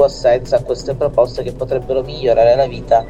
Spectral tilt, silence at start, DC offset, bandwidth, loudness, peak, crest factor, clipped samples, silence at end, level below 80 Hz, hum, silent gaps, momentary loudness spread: -6 dB/octave; 0 s; under 0.1%; 8.8 kHz; -16 LUFS; -2 dBFS; 14 dB; under 0.1%; 0 s; -34 dBFS; none; none; 9 LU